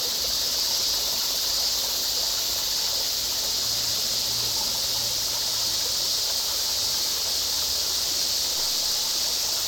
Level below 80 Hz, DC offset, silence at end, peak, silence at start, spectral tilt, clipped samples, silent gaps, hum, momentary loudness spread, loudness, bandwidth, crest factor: -52 dBFS; under 0.1%; 0 s; -12 dBFS; 0 s; 1 dB/octave; under 0.1%; none; none; 1 LU; -22 LUFS; over 20 kHz; 14 dB